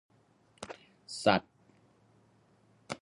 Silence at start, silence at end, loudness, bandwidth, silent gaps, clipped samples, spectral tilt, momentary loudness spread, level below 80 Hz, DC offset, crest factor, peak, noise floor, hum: 0.6 s; 0.05 s; -31 LUFS; 11 kHz; none; under 0.1%; -4.5 dB/octave; 21 LU; -68 dBFS; under 0.1%; 28 dB; -10 dBFS; -67 dBFS; none